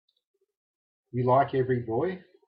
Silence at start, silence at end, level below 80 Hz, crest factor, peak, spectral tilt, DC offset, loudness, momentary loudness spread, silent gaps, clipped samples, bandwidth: 1.15 s; 0.3 s; -68 dBFS; 18 dB; -10 dBFS; -11.5 dB/octave; under 0.1%; -27 LUFS; 9 LU; none; under 0.1%; 5 kHz